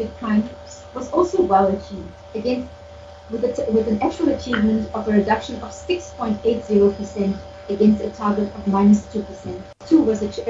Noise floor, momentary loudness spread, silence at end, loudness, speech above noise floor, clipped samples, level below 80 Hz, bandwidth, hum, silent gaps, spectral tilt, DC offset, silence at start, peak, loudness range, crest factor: -40 dBFS; 16 LU; 0 s; -20 LUFS; 20 dB; under 0.1%; -44 dBFS; 7.8 kHz; none; none; -7 dB/octave; under 0.1%; 0 s; -4 dBFS; 3 LU; 18 dB